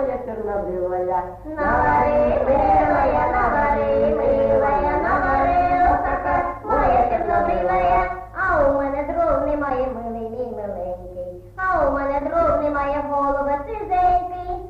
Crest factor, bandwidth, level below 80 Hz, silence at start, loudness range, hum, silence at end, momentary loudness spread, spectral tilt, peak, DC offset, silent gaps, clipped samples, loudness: 12 dB; 6.8 kHz; -34 dBFS; 0 s; 5 LU; none; 0 s; 11 LU; -8.5 dB/octave; -8 dBFS; under 0.1%; none; under 0.1%; -20 LUFS